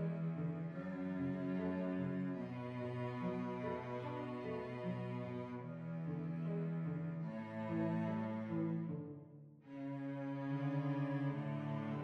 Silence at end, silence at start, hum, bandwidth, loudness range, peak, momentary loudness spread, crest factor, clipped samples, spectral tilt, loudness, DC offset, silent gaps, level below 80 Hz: 0 s; 0 s; none; 6 kHz; 2 LU; -28 dBFS; 6 LU; 14 dB; under 0.1%; -9.5 dB/octave; -42 LUFS; under 0.1%; none; -78 dBFS